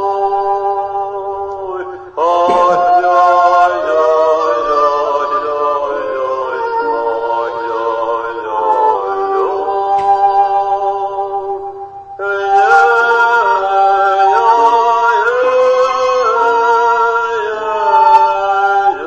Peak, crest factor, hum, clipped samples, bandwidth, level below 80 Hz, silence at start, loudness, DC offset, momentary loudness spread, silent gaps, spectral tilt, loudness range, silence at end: 0 dBFS; 12 dB; none; under 0.1%; 8.4 kHz; -52 dBFS; 0 s; -12 LUFS; under 0.1%; 10 LU; none; -3.5 dB/octave; 5 LU; 0 s